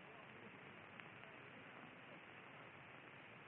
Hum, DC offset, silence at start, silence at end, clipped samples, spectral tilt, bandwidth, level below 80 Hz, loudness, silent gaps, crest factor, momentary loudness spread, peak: none; under 0.1%; 0 s; 0 s; under 0.1%; -3 dB/octave; 4 kHz; under -90 dBFS; -58 LUFS; none; 26 dB; 1 LU; -34 dBFS